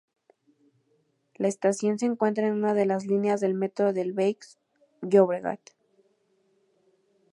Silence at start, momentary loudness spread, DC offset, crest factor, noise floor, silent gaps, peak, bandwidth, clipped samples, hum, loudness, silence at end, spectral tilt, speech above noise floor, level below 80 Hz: 1.4 s; 9 LU; under 0.1%; 22 dB; -70 dBFS; none; -6 dBFS; 11 kHz; under 0.1%; none; -26 LUFS; 1.75 s; -6.5 dB/octave; 45 dB; -82 dBFS